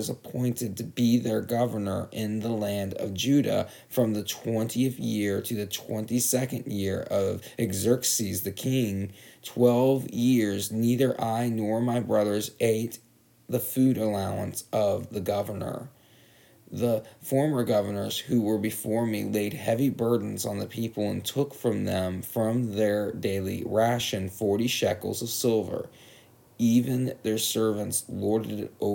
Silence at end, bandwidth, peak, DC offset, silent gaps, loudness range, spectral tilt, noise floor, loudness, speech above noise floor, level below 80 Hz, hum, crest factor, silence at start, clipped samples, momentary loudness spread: 0 s; 19.5 kHz; -8 dBFS; under 0.1%; none; 3 LU; -5 dB/octave; -57 dBFS; -27 LUFS; 30 dB; -66 dBFS; none; 18 dB; 0 s; under 0.1%; 8 LU